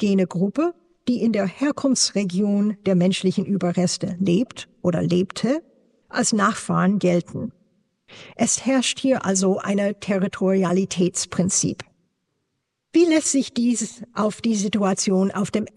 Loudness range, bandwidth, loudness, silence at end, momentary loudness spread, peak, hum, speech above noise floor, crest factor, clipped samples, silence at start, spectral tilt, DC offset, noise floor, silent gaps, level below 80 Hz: 2 LU; 11.5 kHz; -21 LUFS; 0.1 s; 7 LU; -6 dBFS; none; 55 dB; 16 dB; under 0.1%; 0 s; -4.5 dB/octave; under 0.1%; -76 dBFS; none; -64 dBFS